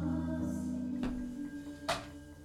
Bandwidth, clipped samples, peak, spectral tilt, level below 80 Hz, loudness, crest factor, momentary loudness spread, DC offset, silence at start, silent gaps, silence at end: 15.5 kHz; under 0.1%; -18 dBFS; -6 dB/octave; -52 dBFS; -38 LUFS; 20 dB; 7 LU; under 0.1%; 0 s; none; 0 s